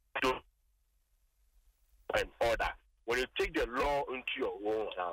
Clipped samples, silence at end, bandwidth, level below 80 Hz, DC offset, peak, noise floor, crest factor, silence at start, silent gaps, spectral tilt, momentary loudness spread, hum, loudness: under 0.1%; 0 s; 16 kHz; -52 dBFS; under 0.1%; -18 dBFS; -74 dBFS; 18 dB; 0.15 s; none; -4 dB/octave; 5 LU; none; -35 LUFS